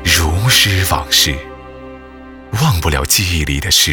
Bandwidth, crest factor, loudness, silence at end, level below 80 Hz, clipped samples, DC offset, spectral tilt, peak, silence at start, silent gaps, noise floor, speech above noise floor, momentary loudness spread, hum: over 20 kHz; 14 dB; -12 LUFS; 0 s; -26 dBFS; under 0.1%; under 0.1%; -2.5 dB/octave; 0 dBFS; 0 s; none; -35 dBFS; 21 dB; 22 LU; none